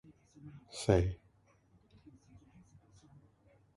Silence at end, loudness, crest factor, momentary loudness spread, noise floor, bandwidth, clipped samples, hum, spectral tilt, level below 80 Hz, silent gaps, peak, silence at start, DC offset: 2.6 s; -34 LUFS; 28 dB; 24 LU; -68 dBFS; 11.5 kHz; under 0.1%; none; -6.5 dB/octave; -52 dBFS; none; -12 dBFS; 0.45 s; under 0.1%